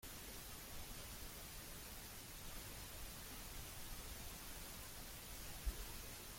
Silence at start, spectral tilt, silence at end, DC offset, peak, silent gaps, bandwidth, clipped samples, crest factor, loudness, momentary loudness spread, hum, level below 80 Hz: 0 s; -2.5 dB/octave; 0 s; under 0.1%; -32 dBFS; none; 16.5 kHz; under 0.1%; 20 dB; -51 LUFS; 3 LU; none; -56 dBFS